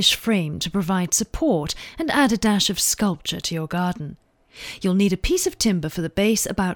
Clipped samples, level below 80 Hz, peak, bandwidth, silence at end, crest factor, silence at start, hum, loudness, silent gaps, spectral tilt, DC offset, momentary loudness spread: under 0.1%; -40 dBFS; -4 dBFS; 19 kHz; 0 s; 18 dB; 0 s; none; -21 LUFS; none; -3.5 dB/octave; under 0.1%; 8 LU